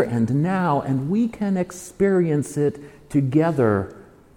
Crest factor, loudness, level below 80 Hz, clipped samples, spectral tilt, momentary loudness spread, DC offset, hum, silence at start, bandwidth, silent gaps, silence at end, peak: 14 dB; -22 LUFS; -52 dBFS; under 0.1%; -8 dB/octave; 6 LU; under 0.1%; none; 0 s; 16.5 kHz; none; 0.35 s; -6 dBFS